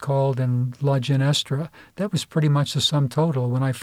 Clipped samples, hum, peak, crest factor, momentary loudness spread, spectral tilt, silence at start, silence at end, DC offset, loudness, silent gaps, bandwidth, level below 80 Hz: under 0.1%; none; -8 dBFS; 14 dB; 7 LU; -6 dB/octave; 0 s; 0 s; under 0.1%; -22 LUFS; none; 14.5 kHz; -60 dBFS